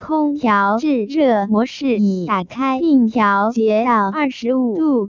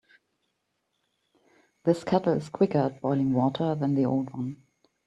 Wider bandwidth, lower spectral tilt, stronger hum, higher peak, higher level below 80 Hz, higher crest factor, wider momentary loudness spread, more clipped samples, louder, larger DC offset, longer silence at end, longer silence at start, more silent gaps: second, 7.2 kHz vs 9.8 kHz; second, -7 dB/octave vs -8.5 dB/octave; neither; first, -4 dBFS vs -8 dBFS; first, -56 dBFS vs -66 dBFS; second, 12 dB vs 20 dB; second, 4 LU vs 7 LU; neither; first, -17 LUFS vs -27 LUFS; neither; second, 0 s vs 0.5 s; second, 0 s vs 1.85 s; neither